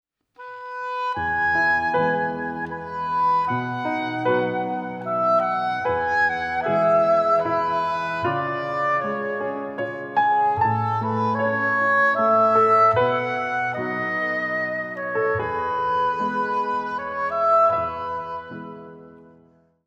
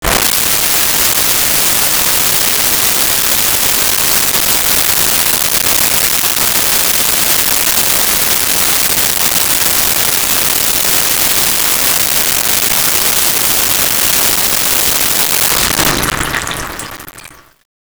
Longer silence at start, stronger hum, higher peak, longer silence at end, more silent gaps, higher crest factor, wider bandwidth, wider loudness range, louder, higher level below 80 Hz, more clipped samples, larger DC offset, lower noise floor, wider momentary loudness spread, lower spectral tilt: first, 0.4 s vs 0 s; neither; second, -8 dBFS vs 0 dBFS; first, 0.65 s vs 0.5 s; neither; about the same, 16 dB vs 12 dB; second, 8 kHz vs over 20 kHz; first, 5 LU vs 1 LU; second, -22 LUFS vs -8 LUFS; second, -58 dBFS vs -34 dBFS; neither; neither; first, -56 dBFS vs -36 dBFS; first, 11 LU vs 1 LU; first, -7 dB/octave vs -0.5 dB/octave